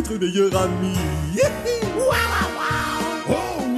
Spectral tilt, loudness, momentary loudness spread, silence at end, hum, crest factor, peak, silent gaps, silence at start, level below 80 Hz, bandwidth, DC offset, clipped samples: -5 dB/octave; -21 LUFS; 5 LU; 0 s; none; 14 dB; -6 dBFS; none; 0 s; -36 dBFS; 13.5 kHz; under 0.1%; under 0.1%